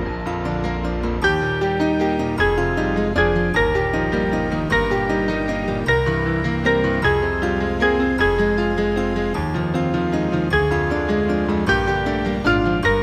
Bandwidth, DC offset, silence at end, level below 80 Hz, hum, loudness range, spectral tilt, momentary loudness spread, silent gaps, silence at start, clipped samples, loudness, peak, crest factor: 13 kHz; under 0.1%; 0 s; -30 dBFS; none; 1 LU; -7 dB/octave; 4 LU; none; 0 s; under 0.1%; -20 LUFS; -4 dBFS; 16 dB